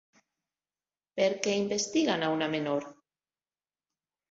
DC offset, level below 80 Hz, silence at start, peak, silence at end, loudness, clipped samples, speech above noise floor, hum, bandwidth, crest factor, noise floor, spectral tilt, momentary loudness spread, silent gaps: under 0.1%; -74 dBFS; 1.15 s; -12 dBFS; 1.4 s; -29 LUFS; under 0.1%; over 61 dB; none; 8 kHz; 20 dB; under -90 dBFS; -3.5 dB/octave; 7 LU; none